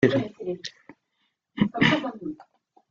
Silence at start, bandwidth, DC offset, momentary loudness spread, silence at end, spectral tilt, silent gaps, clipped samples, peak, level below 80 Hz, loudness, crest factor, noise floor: 0 s; 7.6 kHz; under 0.1%; 18 LU; 0.55 s; -6 dB/octave; none; under 0.1%; -4 dBFS; -60 dBFS; -25 LUFS; 22 dB; -75 dBFS